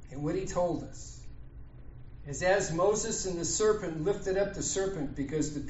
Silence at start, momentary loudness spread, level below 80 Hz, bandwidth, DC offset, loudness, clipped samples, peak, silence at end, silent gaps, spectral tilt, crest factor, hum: 0 s; 23 LU; -48 dBFS; 8 kHz; under 0.1%; -31 LUFS; under 0.1%; -14 dBFS; 0 s; none; -5 dB/octave; 18 dB; none